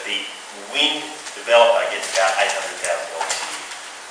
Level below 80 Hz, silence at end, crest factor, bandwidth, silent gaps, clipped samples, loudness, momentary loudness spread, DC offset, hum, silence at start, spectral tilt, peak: -70 dBFS; 0 s; 20 dB; 10.5 kHz; none; under 0.1%; -19 LUFS; 16 LU; under 0.1%; none; 0 s; 0.5 dB/octave; -2 dBFS